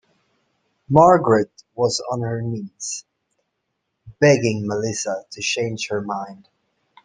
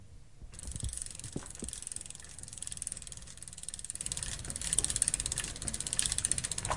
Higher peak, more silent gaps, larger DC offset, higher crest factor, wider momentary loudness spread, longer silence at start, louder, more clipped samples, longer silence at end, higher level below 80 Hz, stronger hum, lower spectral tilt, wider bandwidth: first, -2 dBFS vs -8 dBFS; neither; second, under 0.1% vs 0.2%; second, 20 dB vs 30 dB; about the same, 15 LU vs 15 LU; first, 0.9 s vs 0 s; first, -20 LUFS vs -35 LUFS; neither; first, 0.7 s vs 0 s; second, -58 dBFS vs -50 dBFS; neither; first, -5 dB/octave vs -1.5 dB/octave; second, 10 kHz vs 11.5 kHz